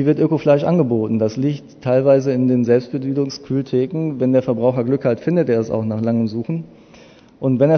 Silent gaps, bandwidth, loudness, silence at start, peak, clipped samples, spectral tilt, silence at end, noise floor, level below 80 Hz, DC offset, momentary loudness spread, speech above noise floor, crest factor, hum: none; 6.6 kHz; -18 LUFS; 0 s; -2 dBFS; under 0.1%; -8.5 dB/octave; 0 s; -45 dBFS; -58 dBFS; under 0.1%; 8 LU; 28 dB; 16 dB; none